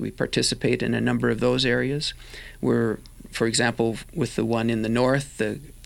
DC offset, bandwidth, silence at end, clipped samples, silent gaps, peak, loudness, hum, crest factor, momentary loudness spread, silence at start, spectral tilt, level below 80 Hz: under 0.1%; 16.5 kHz; 0 s; under 0.1%; none; -6 dBFS; -24 LUFS; none; 18 dB; 7 LU; 0 s; -4.5 dB/octave; -46 dBFS